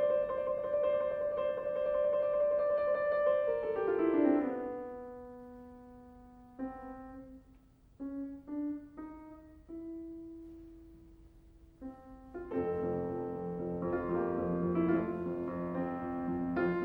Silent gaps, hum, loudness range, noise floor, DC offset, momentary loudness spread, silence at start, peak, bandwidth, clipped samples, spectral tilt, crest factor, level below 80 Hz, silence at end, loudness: none; none; 16 LU; -61 dBFS; under 0.1%; 21 LU; 0 s; -18 dBFS; 4.6 kHz; under 0.1%; -10 dB/octave; 18 dB; -60 dBFS; 0 s; -34 LUFS